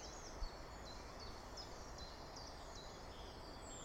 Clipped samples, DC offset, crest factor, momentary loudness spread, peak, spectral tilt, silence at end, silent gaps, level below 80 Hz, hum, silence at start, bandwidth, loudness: under 0.1%; under 0.1%; 18 dB; 2 LU; -34 dBFS; -3.5 dB/octave; 0 s; none; -56 dBFS; none; 0 s; 16.5 kHz; -53 LUFS